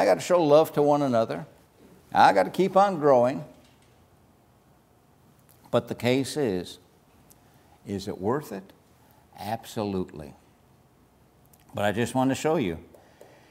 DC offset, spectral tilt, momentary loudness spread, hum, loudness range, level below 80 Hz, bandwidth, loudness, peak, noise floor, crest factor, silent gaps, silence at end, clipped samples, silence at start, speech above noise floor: under 0.1%; -5.5 dB/octave; 20 LU; none; 12 LU; -62 dBFS; 16 kHz; -24 LUFS; -4 dBFS; -60 dBFS; 22 dB; none; 0.7 s; under 0.1%; 0 s; 36 dB